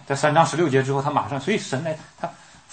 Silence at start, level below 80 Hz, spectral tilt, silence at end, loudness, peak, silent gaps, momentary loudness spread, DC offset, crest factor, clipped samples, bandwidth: 0 s; -64 dBFS; -5.5 dB/octave; 0.35 s; -22 LUFS; -4 dBFS; none; 15 LU; under 0.1%; 18 dB; under 0.1%; 8.8 kHz